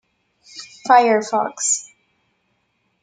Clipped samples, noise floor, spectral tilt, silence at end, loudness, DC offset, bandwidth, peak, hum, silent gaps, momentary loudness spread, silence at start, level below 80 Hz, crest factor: under 0.1%; -68 dBFS; -1.5 dB/octave; 1.2 s; -17 LUFS; under 0.1%; 9.6 kHz; -2 dBFS; none; none; 24 LU; 0.55 s; -76 dBFS; 20 dB